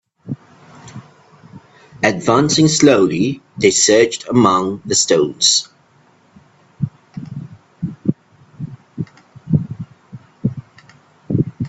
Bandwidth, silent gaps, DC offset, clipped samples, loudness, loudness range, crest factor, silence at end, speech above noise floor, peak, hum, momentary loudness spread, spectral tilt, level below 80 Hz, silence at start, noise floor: 8.6 kHz; none; under 0.1%; under 0.1%; -15 LUFS; 15 LU; 18 dB; 0 s; 39 dB; 0 dBFS; none; 22 LU; -4 dB/octave; -54 dBFS; 0.25 s; -53 dBFS